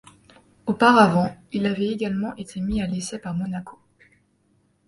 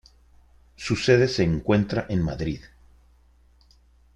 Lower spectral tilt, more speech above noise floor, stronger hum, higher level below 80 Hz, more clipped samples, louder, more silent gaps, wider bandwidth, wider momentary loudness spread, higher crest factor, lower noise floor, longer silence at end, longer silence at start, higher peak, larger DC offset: about the same, -6 dB/octave vs -6.5 dB/octave; first, 43 dB vs 35 dB; neither; about the same, -48 dBFS vs -44 dBFS; neither; about the same, -22 LUFS vs -23 LUFS; neither; about the same, 11.5 kHz vs 11 kHz; first, 15 LU vs 12 LU; about the same, 22 dB vs 22 dB; first, -65 dBFS vs -57 dBFS; second, 1.15 s vs 1.5 s; second, 0.65 s vs 0.8 s; about the same, -2 dBFS vs -4 dBFS; neither